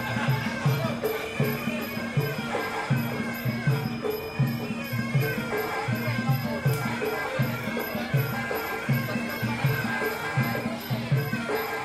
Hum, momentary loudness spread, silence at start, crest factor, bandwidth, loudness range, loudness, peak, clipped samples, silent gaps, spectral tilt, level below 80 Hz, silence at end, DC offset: none; 4 LU; 0 s; 14 dB; 15 kHz; 1 LU; -28 LUFS; -12 dBFS; under 0.1%; none; -6 dB/octave; -56 dBFS; 0 s; under 0.1%